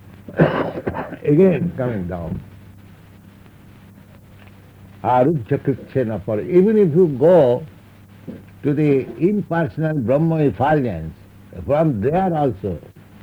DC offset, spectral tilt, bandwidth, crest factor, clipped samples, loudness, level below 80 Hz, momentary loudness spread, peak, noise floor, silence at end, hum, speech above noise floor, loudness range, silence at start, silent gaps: under 0.1%; -10 dB/octave; over 20 kHz; 18 dB; under 0.1%; -18 LUFS; -48 dBFS; 16 LU; -2 dBFS; -44 dBFS; 0.45 s; none; 27 dB; 8 LU; 0.1 s; none